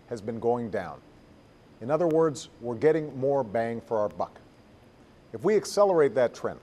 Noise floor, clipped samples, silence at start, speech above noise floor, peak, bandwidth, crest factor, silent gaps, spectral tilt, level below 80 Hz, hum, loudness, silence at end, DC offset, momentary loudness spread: -55 dBFS; under 0.1%; 0.1 s; 28 dB; -10 dBFS; 13 kHz; 18 dB; none; -6 dB/octave; -64 dBFS; none; -27 LUFS; 0.05 s; under 0.1%; 13 LU